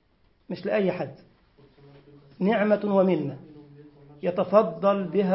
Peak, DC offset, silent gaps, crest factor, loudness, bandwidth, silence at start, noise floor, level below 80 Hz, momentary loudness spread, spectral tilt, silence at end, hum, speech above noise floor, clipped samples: -6 dBFS; under 0.1%; none; 20 dB; -25 LUFS; 5.8 kHz; 0.5 s; -58 dBFS; -66 dBFS; 13 LU; -11.5 dB/octave; 0 s; none; 34 dB; under 0.1%